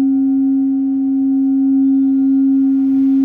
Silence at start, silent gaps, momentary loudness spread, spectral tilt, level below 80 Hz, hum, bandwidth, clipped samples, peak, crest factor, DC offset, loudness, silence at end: 0 s; none; 3 LU; -10 dB/octave; -66 dBFS; none; 1.5 kHz; under 0.1%; -8 dBFS; 4 dB; under 0.1%; -14 LUFS; 0 s